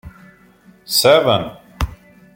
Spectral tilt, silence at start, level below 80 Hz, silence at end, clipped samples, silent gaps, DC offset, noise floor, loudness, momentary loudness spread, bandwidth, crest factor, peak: -3.5 dB/octave; 0.05 s; -34 dBFS; 0.4 s; under 0.1%; none; under 0.1%; -49 dBFS; -16 LUFS; 15 LU; 16.5 kHz; 18 dB; -2 dBFS